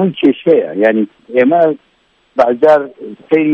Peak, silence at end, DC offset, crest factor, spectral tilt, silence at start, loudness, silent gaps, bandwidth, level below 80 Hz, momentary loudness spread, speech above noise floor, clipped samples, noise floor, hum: 0 dBFS; 0 s; under 0.1%; 12 dB; -8 dB/octave; 0 s; -12 LUFS; none; 6.4 kHz; -60 dBFS; 12 LU; 44 dB; under 0.1%; -56 dBFS; none